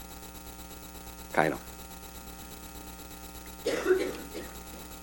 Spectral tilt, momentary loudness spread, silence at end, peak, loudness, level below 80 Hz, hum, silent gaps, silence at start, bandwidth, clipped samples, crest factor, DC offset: -4 dB/octave; 15 LU; 0 s; -6 dBFS; -35 LUFS; -50 dBFS; none; none; 0 s; over 20 kHz; under 0.1%; 30 dB; under 0.1%